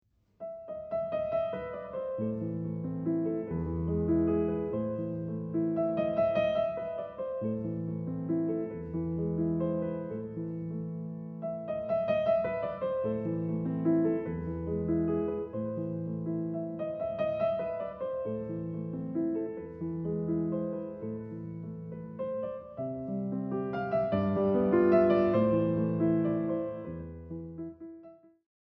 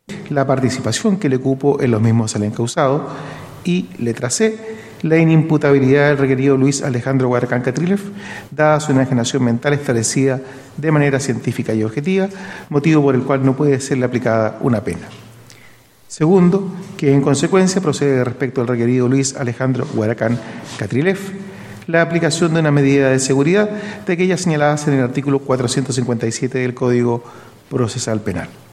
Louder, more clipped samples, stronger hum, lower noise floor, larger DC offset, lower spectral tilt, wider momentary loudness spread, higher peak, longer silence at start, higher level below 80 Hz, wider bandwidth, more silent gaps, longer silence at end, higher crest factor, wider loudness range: second, -32 LUFS vs -16 LUFS; neither; neither; first, -54 dBFS vs -45 dBFS; neither; first, -8.5 dB/octave vs -6 dB/octave; about the same, 12 LU vs 11 LU; second, -14 dBFS vs 0 dBFS; first, 0.4 s vs 0.1 s; about the same, -56 dBFS vs -52 dBFS; second, 5 kHz vs 13.5 kHz; neither; first, 0.55 s vs 0.15 s; about the same, 18 dB vs 16 dB; first, 7 LU vs 4 LU